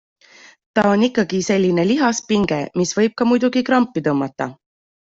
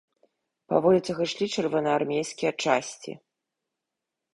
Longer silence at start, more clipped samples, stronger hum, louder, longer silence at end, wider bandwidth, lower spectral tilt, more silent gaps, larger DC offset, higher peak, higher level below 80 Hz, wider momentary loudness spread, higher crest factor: about the same, 0.75 s vs 0.7 s; neither; neither; first, -18 LUFS vs -26 LUFS; second, 0.6 s vs 1.2 s; second, 7.8 kHz vs 11.5 kHz; about the same, -5 dB/octave vs -4.5 dB/octave; neither; neither; first, -2 dBFS vs -6 dBFS; first, -54 dBFS vs -68 dBFS; second, 6 LU vs 16 LU; second, 16 dB vs 22 dB